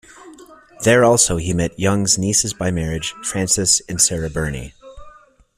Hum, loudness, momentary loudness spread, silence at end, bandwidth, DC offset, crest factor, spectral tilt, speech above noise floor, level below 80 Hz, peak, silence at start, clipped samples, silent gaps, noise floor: none; -17 LUFS; 11 LU; 0.45 s; 16 kHz; under 0.1%; 18 dB; -3.5 dB/octave; 29 dB; -40 dBFS; 0 dBFS; 0.2 s; under 0.1%; none; -47 dBFS